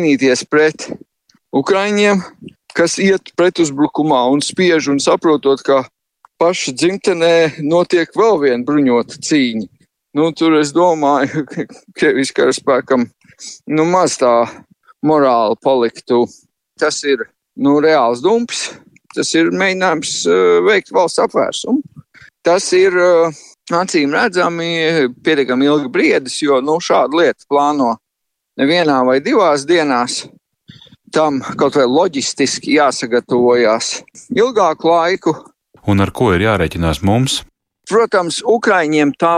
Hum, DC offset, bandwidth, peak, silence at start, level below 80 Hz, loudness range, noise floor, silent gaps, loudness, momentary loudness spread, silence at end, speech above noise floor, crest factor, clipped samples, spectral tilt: none; under 0.1%; 12.5 kHz; -2 dBFS; 0 s; -46 dBFS; 2 LU; -76 dBFS; none; -14 LUFS; 8 LU; 0 s; 62 dB; 12 dB; under 0.1%; -4.5 dB/octave